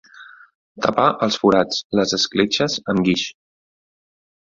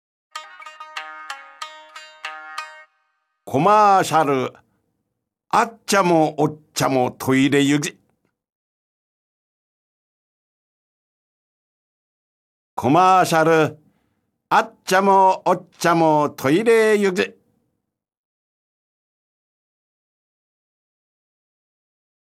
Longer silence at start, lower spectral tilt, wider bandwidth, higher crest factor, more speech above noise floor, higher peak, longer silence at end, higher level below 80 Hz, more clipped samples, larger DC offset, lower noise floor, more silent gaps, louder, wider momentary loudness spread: second, 0.2 s vs 0.35 s; about the same, -4.5 dB/octave vs -5 dB/octave; second, 7.6 kHz vs 16 kHz; about the same, 20 dB vs 18 dB; second, 26 dB vs 61 dB; about the same, -2 dBFS vs -4 dBFS; second, 1.2 s vs 5 s; first, -56 dBFS vs -66 dBFS; neither; neither; second, -44 dBFS vs -78 dBFS; second, 0.54-0.75 s, 1.84-1.90 s vs 8.52-12.77 s; about the same, -19 LUFS vs -18 LUFS; second, 5 LU vs 21 LU